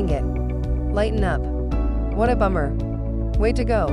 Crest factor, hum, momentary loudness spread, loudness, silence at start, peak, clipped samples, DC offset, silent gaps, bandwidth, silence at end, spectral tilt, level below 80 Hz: 14 dB; none; 5 LU; -23 LUFS; 0 s; -6 dBFS; under 0.1%; under 0.1%; none; 10.5 kHz; 0 s; -8 dB/octave; -24 dBFS